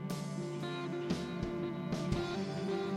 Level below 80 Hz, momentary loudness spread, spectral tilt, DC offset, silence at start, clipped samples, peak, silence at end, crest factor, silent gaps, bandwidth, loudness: -54 dBFS; 4 LU; -6.5 dB/octave; under 0.1%; 0 s; under 0.1%; -20 dBFS; 0 s; 18 dB; none; 16 kHz; -38 LUFS